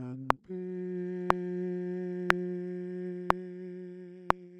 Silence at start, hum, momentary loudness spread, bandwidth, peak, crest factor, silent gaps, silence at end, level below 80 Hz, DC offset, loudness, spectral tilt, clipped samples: 0 s; none; 13 LU; 12 kHz; 0 dBFS; 34 dB; none; 0 s; -56 dBFS; under 0.1%; -34 LUFS; -6.5 dB/octave; under 0.1%